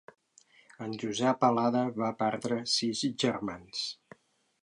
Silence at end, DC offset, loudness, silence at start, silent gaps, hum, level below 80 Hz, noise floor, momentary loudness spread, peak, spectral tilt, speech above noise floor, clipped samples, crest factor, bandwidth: 0.7 s; under 0.1%; -30 LUFS; 0.8 s; none; none; -72 dBFS; -63 dBFS; 11 LU; -12 dBFS; -4.5 dB/octave; 33 dB; under 0.1%; 20 dB; 11.5 kHz